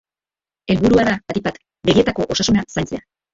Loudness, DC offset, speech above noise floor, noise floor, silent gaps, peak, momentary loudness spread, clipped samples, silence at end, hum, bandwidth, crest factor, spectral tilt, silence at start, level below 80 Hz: -18 LUFS; under 0.1%; over 73 dB; under -90 dBFS; none; -2 dBFS; 12 LU; under 0.1%; 0.35 s; none; 7.8 kHz; 18 dB; -5 dB/octave; 0.7 s; -42 dBFS